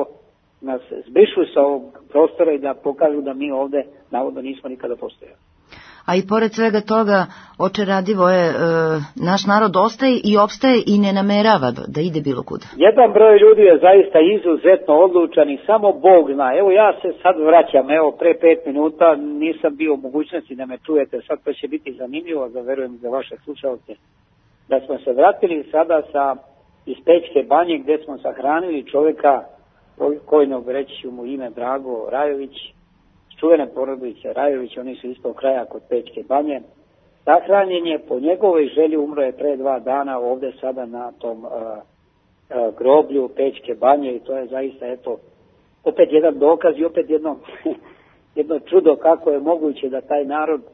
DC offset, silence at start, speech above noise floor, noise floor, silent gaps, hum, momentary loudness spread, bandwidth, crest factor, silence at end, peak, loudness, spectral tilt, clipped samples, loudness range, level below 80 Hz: under 0.1%; 0 s; 42 dB; -59 dBFS; none; none; 16 LU; 6.6 kHz; 16 dB; 0.15 s; 0 dBFS; -17 LUFS; -7 dB/octave; under 0.1%; 11 LU; -62 dBFS